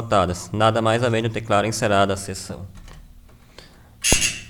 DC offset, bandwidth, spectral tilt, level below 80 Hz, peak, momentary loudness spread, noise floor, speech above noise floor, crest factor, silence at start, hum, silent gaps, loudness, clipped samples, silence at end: under 0.1%; 20 kHz; -3.5 dB/octave; -38 dBFS; -2 dBFS; 14 LU; -47 dBFS; 26 dB; 20 dB; 0 s; none; none; -20 LUFS; under 0.1%; 0 s